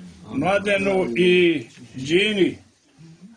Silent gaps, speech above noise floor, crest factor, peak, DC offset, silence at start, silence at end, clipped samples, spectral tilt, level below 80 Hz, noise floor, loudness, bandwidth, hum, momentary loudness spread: none; 29 dB; 16 dB; -6 dBFS; under 0.1%; 0 s; 0.1 s; under 0.1%; -5.5 dB/octave; -56 dBFS; -49 dBFS; -20 LUFS; 10 kHz; none; 14 LU